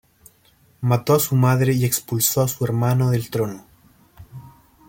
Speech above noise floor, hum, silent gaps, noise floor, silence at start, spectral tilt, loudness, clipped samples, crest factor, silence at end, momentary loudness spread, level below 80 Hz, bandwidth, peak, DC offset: 38 dB; none; none; -57 dBFS; 0.8 s; -5.5 dB/octave; -20 LUFS; under 0.1%; 18 dB; 0.4 s; 8 LU; -54 dBFS; 17 kHz; -4 dBFS; under 0.1%